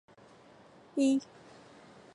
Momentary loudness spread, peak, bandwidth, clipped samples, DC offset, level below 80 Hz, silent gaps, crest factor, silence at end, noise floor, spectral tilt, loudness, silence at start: 26 LU; -18 dBFS; 11 kHz; under 0.1%; under 0.1%; -80 dBFS; none; 18 dB; 0.9 s; -58 dBFS; -4.5 dB/octave; -31 LUFS; 0.95 s